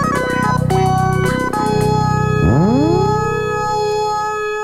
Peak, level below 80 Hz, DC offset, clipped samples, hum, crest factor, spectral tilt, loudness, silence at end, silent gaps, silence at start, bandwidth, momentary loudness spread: -2 dBFS; -32 dBFS; under 0.1%; under 0.1%; none; 12 dB; -6.5 dB/octave; -16 LUFS; 0 s; none; 0 s; 15 kHz; 5 LU